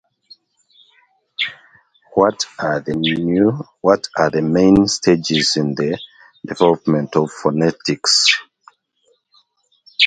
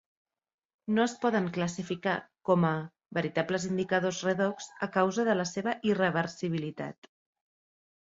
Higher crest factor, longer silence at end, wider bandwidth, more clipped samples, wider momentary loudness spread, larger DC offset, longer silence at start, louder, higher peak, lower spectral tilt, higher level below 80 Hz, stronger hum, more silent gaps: about the same, 18 dB vs 20 dB; second, 0 s vs 1.2 s; first, 9.6 kHz vs 8 kHz; neither; about the same, 11 LU vs 9 LU; neither; first, 1.4 s vs 0.85 s; first, -16 LUFS vs -30 LUFS; first, 0 dBFS vs -12 dBFS; second, -4 dB/octave vs -5.5 dB/octave; first, -48 dBFS vs -70 dBFS; neither; neither